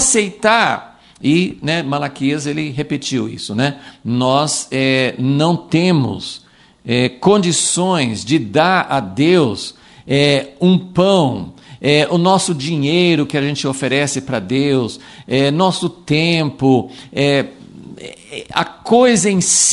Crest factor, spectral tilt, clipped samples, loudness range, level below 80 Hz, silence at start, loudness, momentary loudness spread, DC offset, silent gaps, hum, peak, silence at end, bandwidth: 16 dB; -4 dB/octave; under 0.1%; 3 LU; -52 dBFS; 0 s; -15 LUFS; 10 LU; under 0.1%; none; none; 0 dBFS; 0 s; 11.5 kHz